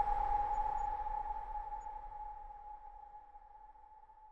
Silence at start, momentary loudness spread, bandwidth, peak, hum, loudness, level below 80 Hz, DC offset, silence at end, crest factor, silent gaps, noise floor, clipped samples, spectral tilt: 0 s; 23 LU; 7.4 kHz; -22 dBFS; none; -40 LUFS; -50 dBFS; under 0.1%; 0 s; 18 dB; none; -59 dBFS; under 0.1%; -5.5 dB/octave